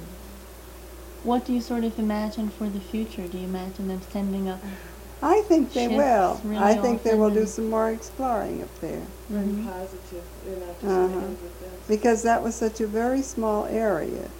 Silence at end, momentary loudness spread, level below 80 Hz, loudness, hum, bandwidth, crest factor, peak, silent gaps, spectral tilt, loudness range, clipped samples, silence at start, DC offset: 0 s; 18 LU; -44 dBFS; -25 LUFS; none; 16.5 kHz; 20 dB; -6 dBFS; none; -6 dB/octave; 8 LU; under 0.1%; 0 s; under 0.1%